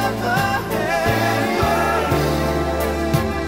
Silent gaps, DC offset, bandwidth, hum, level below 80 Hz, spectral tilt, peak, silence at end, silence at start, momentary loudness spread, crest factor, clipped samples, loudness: none; under 0.1%; 16.5 kHz; none; -32 dBFS; -5.5 dB/octave; -4 dBFS; 0 s; 0 s; 3 LU; 14 dB; under 0.1%; -19 LUFS